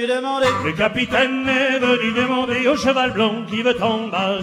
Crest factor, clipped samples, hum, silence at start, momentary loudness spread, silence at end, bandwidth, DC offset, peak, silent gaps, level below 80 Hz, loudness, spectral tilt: 16 dB; under 0.1%; none; 0 s; 3 LU; 0 s; 13 kHz; under 0.1%; -4 dBFS; none; -50 dBFS; -18 LUFS; -4.5 dB/octave